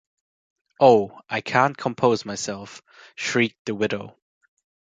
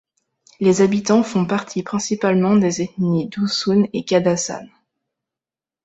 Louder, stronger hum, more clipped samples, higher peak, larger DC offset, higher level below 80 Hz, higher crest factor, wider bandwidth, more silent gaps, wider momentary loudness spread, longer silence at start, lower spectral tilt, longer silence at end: second, -22 LUFS vs -18 LUFS; neither; neither; about the same, -2 dBFS vs -2 dBFS; neither; second, -64 dBFS vs -58 dBFS; first, 22 dB vs 16 dB; first, 9.4 kHz vs 8.2 kHz; first, 3.59-3.65 s vs none; first, 18 LU vs 7 LU; first, 0.8 s vs 0.6 s; about the same, -4.5 dB/octave vs -5.5 dB/octave; second, 0.85 s vs 1.2 s